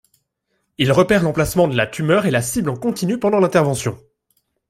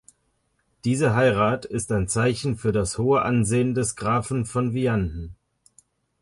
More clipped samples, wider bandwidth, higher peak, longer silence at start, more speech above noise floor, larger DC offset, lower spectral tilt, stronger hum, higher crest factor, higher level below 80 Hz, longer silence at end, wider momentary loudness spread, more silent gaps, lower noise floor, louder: neither; first, 16.5 kHz vs 11.5 kHz; first, -2 dBFS vs -8 dBFS; about the same, 0.8 s vs 0.85 s; first, 54 dB vs 48 dB; neither; about the same, -5.5 dB/octave vs -6 dB/octave; neither; about the same, 16 dB vs 16 dB; about the same, -46 dBFS vs -44 dBFS; about the same, 0.75 s vs 0.85 s; about the same, 7 LU vs 7 LU; neither; about the same, -71 dBFS vs -70 dBFS; first, -18 LUFS vs -23 LUFS